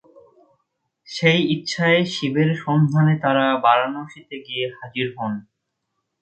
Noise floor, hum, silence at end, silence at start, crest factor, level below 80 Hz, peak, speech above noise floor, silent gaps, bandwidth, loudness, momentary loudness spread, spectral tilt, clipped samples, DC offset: -76 dBFS; none; 0.8 s; 1.1 s; 20 dB; -64 dBFS; 0 dBFS; 57 dB; none; 8.6 kHz; -20 LUFS; 14 LU; -6 dB/octave; under 0.1%; under 0.1%